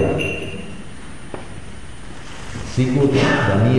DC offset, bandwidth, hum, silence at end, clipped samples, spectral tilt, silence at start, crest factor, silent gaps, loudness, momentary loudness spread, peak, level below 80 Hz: 3%; 11.5 kHz; none; 0 s; under 0.1%; -6.5 dB/octave; 0 s; 16 dB; none; -19 LUFS; 21 LU; -4 dBFS; -40 dBFS